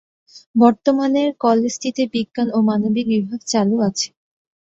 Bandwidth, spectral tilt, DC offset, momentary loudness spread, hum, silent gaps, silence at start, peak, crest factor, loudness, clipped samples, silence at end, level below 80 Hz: 7.8 kHz; -5 dB/octave; under 0.1%; 7 LU; none; 0.46-0.54 s; 0.35 s; -2 dBFS; 16 dB; -18 LUFS; under 0.1%; 0.7 s; -62 dBFS